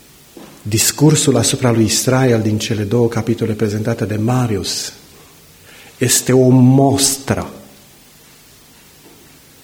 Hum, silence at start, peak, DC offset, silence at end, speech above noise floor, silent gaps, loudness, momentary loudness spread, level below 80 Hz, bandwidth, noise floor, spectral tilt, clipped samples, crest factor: none; 0.35 s; 0 dBFS; under 0.1%; 2 s; 31 dB; none; -14 LUFS; 10 LU; -46 dBFS; 17 kHz; -44 dBFS; -4.5 dB/octave; under 0.1%; 16 dB